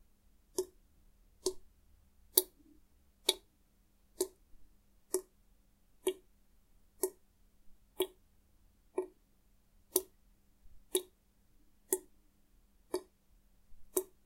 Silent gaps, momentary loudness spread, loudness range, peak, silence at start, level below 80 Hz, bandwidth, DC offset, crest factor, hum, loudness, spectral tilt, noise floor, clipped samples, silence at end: none; 13 LU; 7 LU; -2 dBFS; 0.6 s; -68 dBFS; 16 kHz; under 0.1%; 42 dB; none; -38 LUFS; -1 dB/octave; -70 dBFS; under 0.1%; 0.2 s